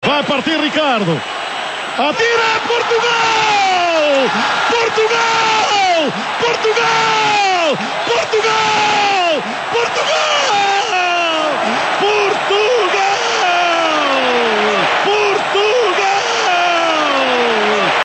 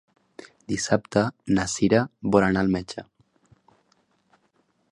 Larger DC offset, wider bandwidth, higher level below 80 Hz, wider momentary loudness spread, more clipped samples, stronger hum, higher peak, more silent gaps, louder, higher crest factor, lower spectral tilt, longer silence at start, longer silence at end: neither; second, 8.8 kHz vs 11.5 kHz; second, -58 dBFS vs -52 dBFS; second, 4 LU vs 13 LU; neither; neither; about the same, -4 dBFS vs -4 dBFS; neither; first, -13 LUFS vs -23 LUFS; second, 10 dB vs 22 dB; second, -2.5 dB/octave vs -5.5 dB/octave; second, 0 s vs 0.7 s; second, 0 s vs 1.9 s